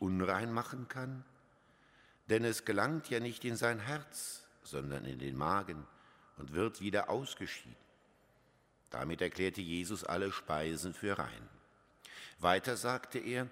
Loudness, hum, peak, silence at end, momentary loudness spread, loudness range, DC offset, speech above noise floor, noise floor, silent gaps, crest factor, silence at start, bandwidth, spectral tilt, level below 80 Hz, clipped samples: -38 LUFS; none; -14 dBFS; 0 s; 14 LU; 3 LU; under 0.1%; 33 dB; -70 dBFS; none; 26 dB; 0 s; 16 kHz; -4.5 dB/octave; -64 dBFS; under 0.1%